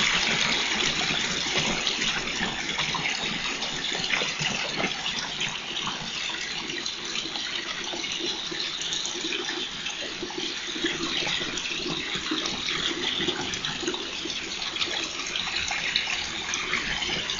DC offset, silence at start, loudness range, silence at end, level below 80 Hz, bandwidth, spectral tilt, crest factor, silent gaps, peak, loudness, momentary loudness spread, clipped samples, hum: under 0.1%; 0 s; 4 LU; 0 s; -52 dBFS; 8 kHz; -1.5 dB/octave; 22 dB; none; -6 dBFS; -27 LUFS; 6 LU; under 0.1%; none